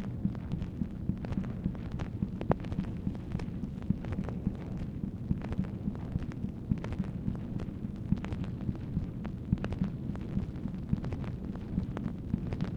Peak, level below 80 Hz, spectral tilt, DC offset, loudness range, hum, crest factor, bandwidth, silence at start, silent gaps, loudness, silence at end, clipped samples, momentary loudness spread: -8 dBFS; -44 dBFS; -9.5 dB/octave; under 0.1%; 1 LU; none; 26 dB; 8.6 kHz; 0 s; none; -36 LUFS; 0 s; under 0.1%; 4 LU